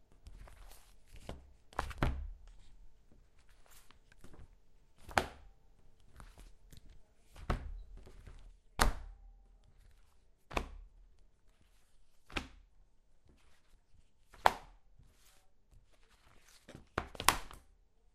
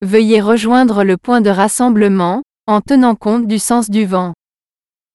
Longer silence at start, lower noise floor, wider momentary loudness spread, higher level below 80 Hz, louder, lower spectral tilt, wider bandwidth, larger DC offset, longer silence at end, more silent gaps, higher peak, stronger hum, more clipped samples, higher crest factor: about the same, 0 s vs 0 s; second, -66 dBFS vs under -90 dBFS; first, 28 LU vs 6 LU; about the same, -48 dBFS vs -52 dBFS; second, -38 LUFS vs -12 LUFS; second, -3 dB/octave vs -5.5 dB/octave; first, 15.5 kHz vs 12 kHz; neither; second, 0.55 s vs 0.8 s; neither; about the same, 0 dBFS vs 0 dBFS; neither; neither; first, 42 dB vs 12 dB